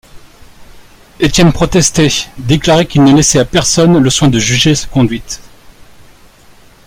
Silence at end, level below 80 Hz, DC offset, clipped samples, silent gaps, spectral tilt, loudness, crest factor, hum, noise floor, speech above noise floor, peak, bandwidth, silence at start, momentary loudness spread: 1.45 s; -30 dBFS; under 0.1%; under 0.1%; none; -4.5 dB/octave; -9 LUFS; 12 dB; none; -41 dBFS; 31 dB; 0 dBFS; 16 kHz; 0.15 s; 8 LU